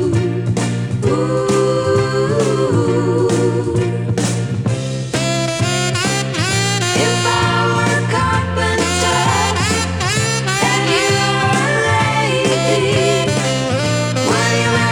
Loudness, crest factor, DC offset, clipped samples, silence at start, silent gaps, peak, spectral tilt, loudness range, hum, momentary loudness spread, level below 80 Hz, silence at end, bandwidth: -15 LUFS; 14 dB; under 0.1%; under 0.1%; 0 s; none; -2 dBFS; -4.5 dB/octave; 3 LU; none; 4 LU; -40 dBFS; 0 s; 17.5 kHz